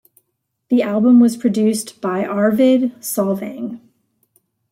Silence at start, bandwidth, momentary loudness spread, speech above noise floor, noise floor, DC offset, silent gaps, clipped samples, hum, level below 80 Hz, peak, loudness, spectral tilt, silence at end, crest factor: 0.7 s; 16 kHz; 14 LU; 57 dB; -72 dBFS; under 0.1%; none; under 0.1%; none; -66 dBFS; -4 dBFS; -16 LUFS; -6 dB/octave; 0.95 s; 14 dB